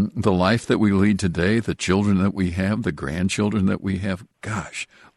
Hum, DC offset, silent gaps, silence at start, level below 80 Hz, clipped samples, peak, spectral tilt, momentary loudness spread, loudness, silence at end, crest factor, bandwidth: none; under 0.1%; none; 0 s; -46 dBFS; under 0.1%; -4 dBFS; -6 dB/octave; 10 LU; -22 LUFS; 0.35 s; 16 dB; 12 kHz